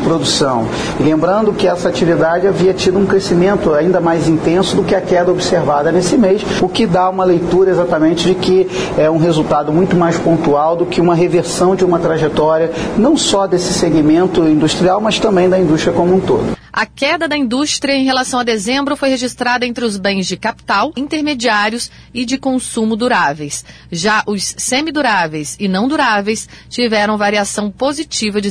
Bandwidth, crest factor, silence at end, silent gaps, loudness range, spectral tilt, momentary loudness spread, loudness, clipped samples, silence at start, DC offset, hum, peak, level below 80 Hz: 11 kHz; 12 dB; 0 s; none; 4 LU; -4.5 dB/octave; 6 LU; -13 LUFS; under 0.1%; 0 s; under 0.1%; none; -2 dBFS; -40 dBFS